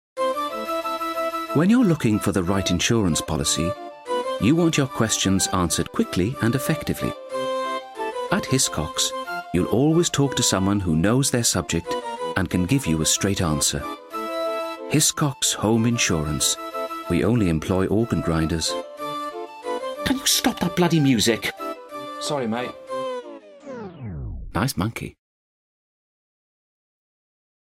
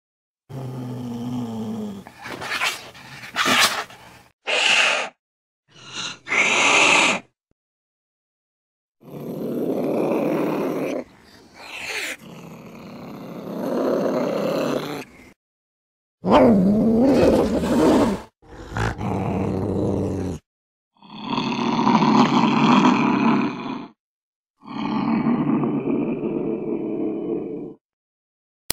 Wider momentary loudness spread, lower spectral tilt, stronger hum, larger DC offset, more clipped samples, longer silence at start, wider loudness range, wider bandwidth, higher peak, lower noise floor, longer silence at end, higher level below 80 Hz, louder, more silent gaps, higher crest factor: second, 11 LU vs 20 LU; about the same, -4 dB/octave vs -4.5 dB/octave; neither; neither; neither; second, 0.15 s vs 0.5 s; about the same, 9 LU vs 8 LU; about the same, 16 kHz vs 16 kHz; about the same, -4 dBFS vs -2 dBFS; first, under -90 dBFS vs -49 dBFS; first, 2.5 s vs 1 s; about the same, -44 dBFS vs -48 dBFS; about the same, -22 LUFS vs -20 LUFS; second, none vs 4.33-4.39 s, 5.19-5.63 s, 7.52-8.95 s, 15.36-16.18 s, 20.46-20.91 s, 24.00-24.44 s, 24.50-24.54 s; about the same, 20 dB vs 20 dB